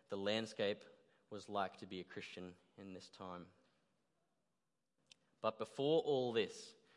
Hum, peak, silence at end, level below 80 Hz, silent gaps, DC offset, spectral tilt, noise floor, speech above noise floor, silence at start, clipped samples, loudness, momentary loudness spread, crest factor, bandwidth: none; -24 dBFS; 0.25 s; under -90 dBFS; none; under 0.1%; -5 dB/octave; under -90 dBFS; over 48 dB; 0.1 s; under 0.1%; -42 LUFS; 18 LU; 20 dB; 11.5 kHz